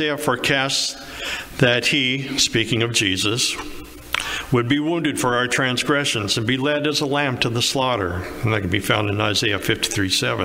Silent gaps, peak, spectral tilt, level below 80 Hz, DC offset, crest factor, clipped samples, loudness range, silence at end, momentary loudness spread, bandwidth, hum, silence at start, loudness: none; -2 dBFS; -3.5 dB/octave; -46 dBFS; under 0.1%; 18 dB; under 0.1%; 1 LU; 0 s; 7 LU; 16 kHz; none; 0 s; -20 LUFS